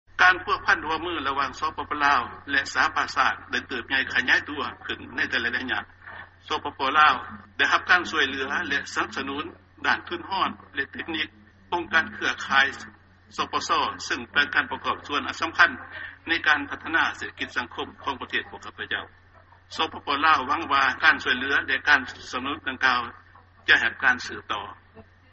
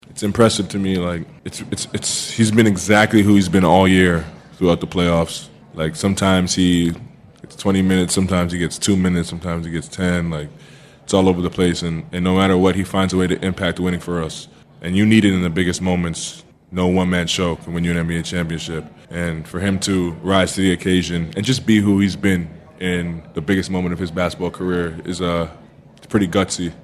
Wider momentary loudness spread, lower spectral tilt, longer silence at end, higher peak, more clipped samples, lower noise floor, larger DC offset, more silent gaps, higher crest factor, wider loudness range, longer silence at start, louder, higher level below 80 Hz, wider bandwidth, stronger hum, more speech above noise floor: about the same, 13 LU vs 12 LU; second, 0.5 dB/octave vs -5 dB/octave; first, 0.3 s vs 0 s; about the same, -2 dBFS vs 0 dBFS; neither; first, -54 dBFS vs -44 dBFS; neither; neither; first, 24 dB vs 18 dB; about the same, 5 LU vs 6 LU; about the same, 0.15 s vs 0.1 s; second, -24 LUFS vs -18 LUFS; second, -58 dBFS vs -46 dBFS; second, 8 kHz vs 13.5 kHz; neither; about the same, 28 dB vs 27 dB